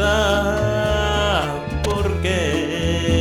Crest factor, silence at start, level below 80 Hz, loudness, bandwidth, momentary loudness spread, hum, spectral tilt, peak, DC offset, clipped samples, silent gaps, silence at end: 12 dB; 0 s; -28 dBFS; -20 LUFS; 16 kHz; 4 LU; none; -5 dB/octave; -6 dBFS; under 0.1%; under 0.1%; none; 0 s